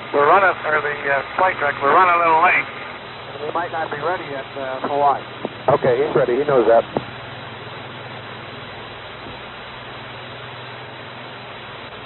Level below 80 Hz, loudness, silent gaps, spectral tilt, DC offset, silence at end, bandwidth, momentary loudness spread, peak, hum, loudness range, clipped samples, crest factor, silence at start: -56 dBFS; -18 LUFS; none; -2.5 dB/octave; under 0.1%; 0 s; 4.3 kHz; 19 LU; -4 dBFS; none; 15 LU; under 0.1%; 16 dB; 0 s